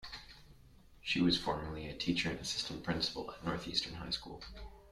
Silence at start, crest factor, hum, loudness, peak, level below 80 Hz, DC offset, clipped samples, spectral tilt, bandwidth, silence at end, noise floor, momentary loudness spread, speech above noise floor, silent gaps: 0 s; 20 dB; none; -36 LUFS; -18 dBFS; -56 dBFS; under 0.1%; under 0.1%; -4 dB/octave; 14 kHz; 0 s; -60 dBFS; 17 LU; 22 dB; none